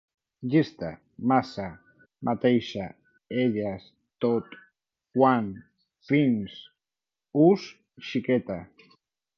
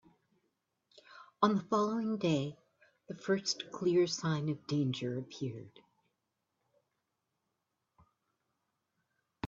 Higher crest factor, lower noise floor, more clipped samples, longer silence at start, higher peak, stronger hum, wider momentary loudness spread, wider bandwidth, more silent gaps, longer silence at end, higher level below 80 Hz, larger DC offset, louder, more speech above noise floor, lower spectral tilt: about the same, 20 dB vs 24 dB; first, under -90 dBFS vs -85 dBFS; neither; second, 0.4 s vs 1.1 s; first, -8 dBFS vs -12 dBFS; neither; first, 18 LU vs 12 LU; second, 6.8 kHz vs 7.8 kHz; neither; first, 0.75 s vs 0 s; first, -62 dBFS vs -78 dBFS; neither; first, -26 LUFS vs -34 LUFS; first, over 65 dB vs 51 dB; first, -8 dB/octave vs -5.5 dB/octave